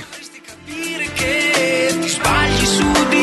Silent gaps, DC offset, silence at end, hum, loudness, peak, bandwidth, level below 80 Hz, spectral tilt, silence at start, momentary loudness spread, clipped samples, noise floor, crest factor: none; under 0.1%; 0 s; none; -16 LUFS; -2 dBFS; 12.5 kHz; -34 dBFS; -3 dB/octave; 0 s; 19 LU; under 0.1%; -37 dBFS; 14 dB